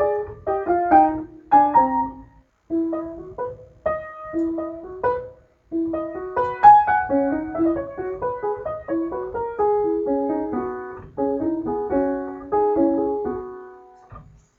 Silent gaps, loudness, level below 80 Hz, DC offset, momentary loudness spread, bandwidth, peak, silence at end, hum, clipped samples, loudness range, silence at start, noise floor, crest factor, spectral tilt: none; -22 LUFS; -50 dBFS; under 0.1%; 15 LU; 4.5 kHz; -2 dBFS; 0.35 s; none; under 0.1%; 8 LU; 0 s; -49 dBFS; 20 dB; -9 dB/octave